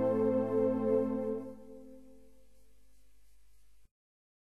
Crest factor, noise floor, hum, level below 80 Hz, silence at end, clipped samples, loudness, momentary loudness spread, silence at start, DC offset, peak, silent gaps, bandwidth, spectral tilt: 16 dB; -67 dBFS; 50 Hz at -70 dBFS; -68 dBFS; 0.5 s; under 0.1%; -32 LUFS; 23 LU; 0 s; 0.2%; -20 dBFS; none; 12.5 kHz; -9.5 dB/octave